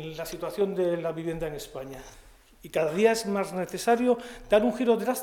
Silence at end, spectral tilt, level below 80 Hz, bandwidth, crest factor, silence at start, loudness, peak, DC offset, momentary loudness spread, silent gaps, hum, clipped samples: 0 s; -5 dB/octave; -54 dBFS; 18 kHz; 20 dB; 0 s; -27 LUFS; -8 dBFS; under 0.1%; 14 LU; none; none; under 0.1%